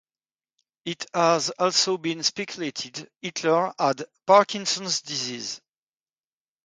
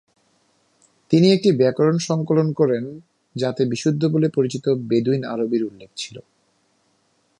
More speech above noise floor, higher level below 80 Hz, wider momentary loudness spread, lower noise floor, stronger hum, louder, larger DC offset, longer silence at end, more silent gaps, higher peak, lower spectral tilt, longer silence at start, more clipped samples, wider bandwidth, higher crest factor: first, over 66 dB vs 46 dB; second, -74 dBFS vs -66 dBFS; about the same, 15 LU vs 16 LU; first, under -90 dBFS vs -65 dBFS; neither; second, -24 LUFS vs -20 LUFS; neither; about the same, 1.1 s vs 1.2 s; neither; about the same, -4 dBFS vs -4 dBFS; second, -2.5 dB/octave vs -6.5 dB/octave; second, 0.85 s vs 1.1 s; neither; about the same, 9.6 kHz vs 10.5 kHz; about the same, 22 dB vs 18 dB